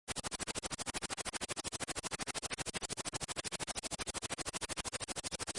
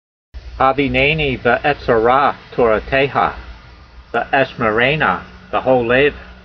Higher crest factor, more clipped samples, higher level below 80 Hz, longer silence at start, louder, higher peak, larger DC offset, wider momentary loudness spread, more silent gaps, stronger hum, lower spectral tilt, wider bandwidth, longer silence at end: about the same, 18 dB vs 16 dB; neither; second, -60 dBFS vs -36 dBFS; second, 0.05 s vs 0.35 s; second, -40 LUFS vs -15 LUFS; second, -24 dBFS vs 0 dBFS; neither; second, 1 LU vs 7 LU; neither; neither; second, -1.5 dB/octave vs -7.5 dB/octave; first, 11.5 kHz vs 6.2 kHz; about the same, 0 s vs 0.1 s